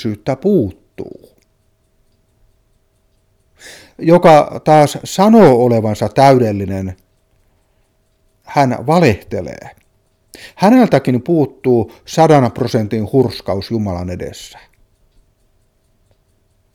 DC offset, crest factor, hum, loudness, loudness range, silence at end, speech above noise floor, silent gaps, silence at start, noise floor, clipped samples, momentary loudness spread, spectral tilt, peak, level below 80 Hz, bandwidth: under 0.1%; 14 dB; none; -13 LUFS; 11 LU; 2.25 s; 46 dB; none; 0 s; -59 dBFS; under 0.1%; 18 LU; -7 dB/octave; 0 dBFS; -48 dBFS; 16.5 kHz